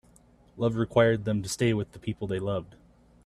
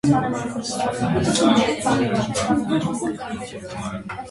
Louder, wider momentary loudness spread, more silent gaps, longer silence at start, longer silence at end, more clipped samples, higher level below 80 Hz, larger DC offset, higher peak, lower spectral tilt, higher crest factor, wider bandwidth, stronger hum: second, -28 LUFS vs -22 LUFS; about the same, 11 LU vs 13 LU; neither; first, 0.55 s vs 0.05 s; first, 0.6 s vs 0 s; neither; second, -56 dBFS vs -46 dBFS; neither; about the same, -8 dBFS vs -6 dBFS; about the same, -6 dB/octave vs -5 dB/octave; first, 22 dB vs 16 dB; first, 13.5 kHz vs 11.5 kHz; neither